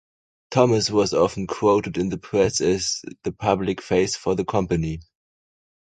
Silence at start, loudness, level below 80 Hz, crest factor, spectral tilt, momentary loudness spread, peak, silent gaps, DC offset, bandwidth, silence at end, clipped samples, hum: 0.5 s; -22 LUFS; -46 dBFS; 20 dB; -5 dB/octave; 7 LU; -2 dBFS; none; under 0.1%; 9.4 kHz; 0.85 s; under 0.1%; none